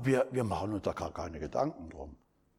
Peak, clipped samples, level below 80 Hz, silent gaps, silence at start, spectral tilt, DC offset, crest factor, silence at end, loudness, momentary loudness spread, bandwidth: -16 dBFS; under 0.1%; -54 dBFS; none; 0 s; -7 dB/octave; under 0.1%; 18 dB; 0.45 s; -34 LUFS; 17 LU; 16 kHz